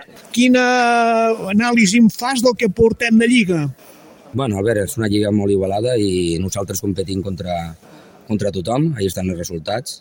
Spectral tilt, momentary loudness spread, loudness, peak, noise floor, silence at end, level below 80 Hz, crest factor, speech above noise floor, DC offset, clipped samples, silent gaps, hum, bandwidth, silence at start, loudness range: -5 dB/octave; 11 LU; -17 LUFS; -2 dBFS; -43 dBFS; 0.05 s; -46 dBFS; 16 dB; 26 dB; under 0.1%; under 0.1%; none; none; 17 kHz; 0 s; 8 LU